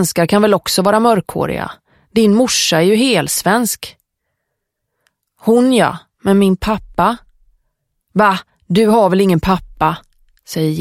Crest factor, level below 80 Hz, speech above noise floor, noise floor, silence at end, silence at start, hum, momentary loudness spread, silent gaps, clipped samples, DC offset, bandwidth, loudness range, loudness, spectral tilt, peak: 14 dB; -40 dBFS; 61 dB; -74 dBFS; 0 s; 0 s; none; 10 LU; none; under 0.1%; under 0.1%; 16.5 kHz; 3 LU; -14 LUFS; -4.5 dB/octave; 0 dBFS